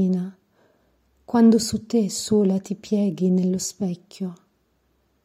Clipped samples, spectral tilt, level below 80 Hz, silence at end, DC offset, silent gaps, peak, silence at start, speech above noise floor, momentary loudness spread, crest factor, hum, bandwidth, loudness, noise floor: under 0.1%; -6 dB/octave; -60 dBFS; 0.9 s; under 0.1%; none; -6 dBFS; 0 s; 46 dB; 16 LU; 16 dB; none; 15 kHz; -22 LUFS; -67 dBFS